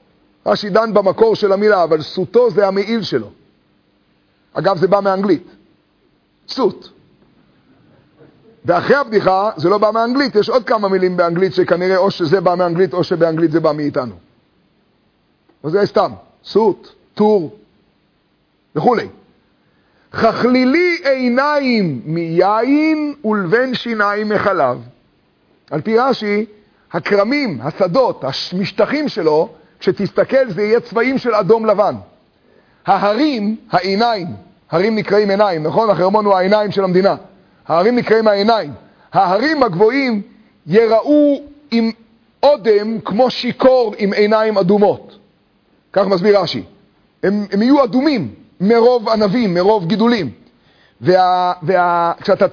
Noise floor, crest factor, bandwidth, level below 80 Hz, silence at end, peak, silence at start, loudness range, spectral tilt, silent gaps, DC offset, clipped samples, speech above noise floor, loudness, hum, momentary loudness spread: -60 dBFS; 14 dB; 5.4 kHz; -56 dBFS; 0 s; 0 dBFS; 0.45 s; 5 LU; -7 dB/octave; none; under 0.1%; under 0.1%; 46 dB; -15 LUFS; none; 9 LU